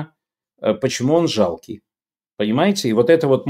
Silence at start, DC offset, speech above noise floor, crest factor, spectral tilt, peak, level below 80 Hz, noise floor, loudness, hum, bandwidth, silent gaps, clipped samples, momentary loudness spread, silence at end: 0 s; under 0.1%; over 73 dB; 18 dB; -5.5 dB/octave; -2 dBFS; -60 dBFS; under -90 dBFS; -18 LUFS; none; 15 kHz; none; under 0.1%; 19 LU; 0 s